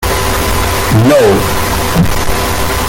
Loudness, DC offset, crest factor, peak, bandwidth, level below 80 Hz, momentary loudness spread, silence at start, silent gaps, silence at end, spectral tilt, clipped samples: -11 LUFS; under 0.1%; 10 dB; 0 dBFS; 17 kHz; -20 dBFS; 6 LU; 0 s; none; 0 s; -4.5 dB/octave; under 0.1%